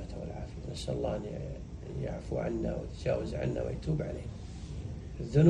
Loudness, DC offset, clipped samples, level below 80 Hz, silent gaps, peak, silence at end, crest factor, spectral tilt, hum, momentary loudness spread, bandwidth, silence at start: -37 LUFS; under 0.1%; under 0.1%; -44 dBFS; none; -10 dBFS; 0 s; 22 dB; -8 dB/octave; none; 9 LU; 10 kHz; 0 s